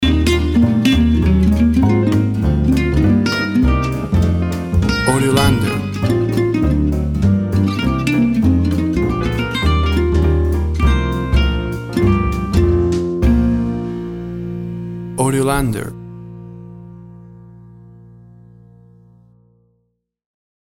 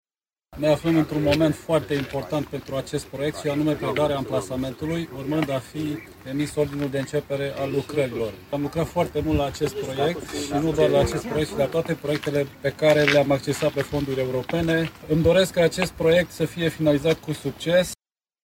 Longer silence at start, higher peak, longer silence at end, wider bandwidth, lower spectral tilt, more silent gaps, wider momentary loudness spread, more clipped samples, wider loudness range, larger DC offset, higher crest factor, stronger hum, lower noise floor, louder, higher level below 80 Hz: second, 0 s vs 0.5 s; about the same, 0 dBFS vs -2 dBFS; first, 3.35 s vs 0.5 s; about the same, 16 kHz vs 16.5 kHz; about the same, -6.5 dB/octave vs -5.5 dB/octave; neither; first, 12 LU vs 9 LU; neither; first, 8 LU vs 5 LU; neither; second, 16 dB vs 22 dB; neither; first, -68 dBFS vs -62 dBFS; first, -16 LUFS vs -24 LUFS; first, -22 dBFS vs -46 dBFS